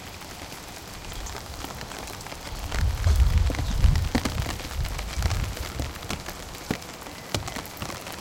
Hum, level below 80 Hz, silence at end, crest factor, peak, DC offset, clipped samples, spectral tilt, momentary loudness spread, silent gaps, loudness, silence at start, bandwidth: none; -30 dBFS; 0 s; 20 dB; -8 dBFS; under 0.1%; under 0.1%; -4.5 dB/octave; 14 LU; none; -30 LUFS; 0 s; 17 kHz